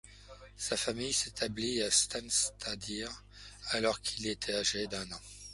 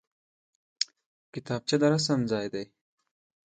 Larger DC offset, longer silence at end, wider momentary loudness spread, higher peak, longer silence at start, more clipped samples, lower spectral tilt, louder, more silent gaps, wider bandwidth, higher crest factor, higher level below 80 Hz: neither; second, 0 s vs 0.8 s; about the same, 17 LU vs 18 LU; second, -14 dBFS vs -6 dBFS; second, 0.05 s vs 0.8 s; neither; second, -1.5 dB/octave vs -5 dB/octave; second, -33 LUFS vs -28 LUFS; second, none vs 1.06-1.33 s; first, 12 kHz vs 9.2 kHz; about the same, 22 dB vs 24 dB; first, -58 dBFS vs -68 dBFS